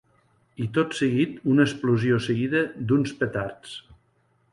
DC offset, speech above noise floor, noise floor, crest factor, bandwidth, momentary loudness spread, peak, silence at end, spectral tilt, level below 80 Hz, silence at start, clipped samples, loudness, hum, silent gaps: under 0.1%; 43 dB; -66 dBFS; 18 dB; 11.5 kHz; 13 LU; -6 dBFS; 0.6 s; -6.5 dB/octave; -58 dBFS; 0.6 s; under 0.1%; -24 LUFS; none; none